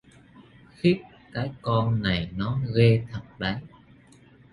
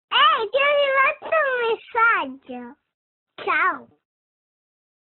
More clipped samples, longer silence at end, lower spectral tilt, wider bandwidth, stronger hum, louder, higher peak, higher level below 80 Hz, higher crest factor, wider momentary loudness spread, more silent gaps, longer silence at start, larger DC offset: neither; second, 0.85 s vs 1.2 s; first, -8.5 dB/octave vs -5.5 dB/octave; first, 10.5 kHz vs 4.3 kHz; neither; second, -26 LUFS vs -19 LUFS; about the same, -6 dBFS vs -6 dBFS; first, -50 dBFS vs -70 dBFS; about the same, 20 dB vs 16 dB; second, 12 LU vs 17 LU; second, none vs 2.94-3.26 s; first, 0.85 s vs 0.1 s; neither